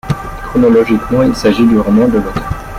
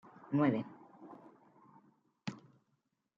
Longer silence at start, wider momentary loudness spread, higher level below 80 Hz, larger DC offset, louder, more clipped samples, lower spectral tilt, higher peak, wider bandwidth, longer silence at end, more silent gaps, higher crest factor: second, 0.05 s vs 0.3 s; second, 11 LU vs 25 LU; first, -28 dBFS vs -86 dBFS; neither; first, -12 LUFS vs -36 LUFS; neither; about the same, -7 dB/octave vs -8 dB/octave; first, -2 dBFS vs -18 dBFS; first, 15 kHz vs 7.4 kHz; second, 0 s vs 0.8 s; neither; second, 10 dB vs 22 dB